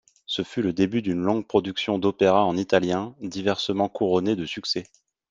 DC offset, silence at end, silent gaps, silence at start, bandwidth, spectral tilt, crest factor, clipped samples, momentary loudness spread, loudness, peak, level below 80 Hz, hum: under 0.1%; 0.45 s; none; 0.3 s; 7.8 kHz; -5.5 dB/octave; 20 dB; under 0.1%; 8 LU; -24 LUFS; -4 dBFS; -62 dBFS; none